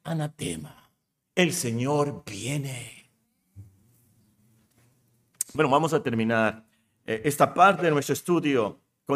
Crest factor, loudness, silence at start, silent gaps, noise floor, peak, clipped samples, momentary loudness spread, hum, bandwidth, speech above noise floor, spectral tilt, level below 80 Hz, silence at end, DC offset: 22 dB; -25 LUFS; 0.05 s; none; -74 dBFS; -6 dBFS; under 0.1%; 18 LU; none; 15.5 kHz; 49 dB; -5 dB/octave; -66 dBFS; 0 s; under 0.1%